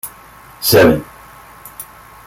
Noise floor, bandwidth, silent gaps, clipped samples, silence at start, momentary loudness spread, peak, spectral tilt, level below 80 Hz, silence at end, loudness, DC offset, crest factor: -40 dBFS; 17 kHz; none; under 0.1%; 0.05 s; 25 LU; 0 dBFS; -4.5 dB/octave; -42 dBFS; 0.45 s; -12 LUFS; under 0.1%; 18 dB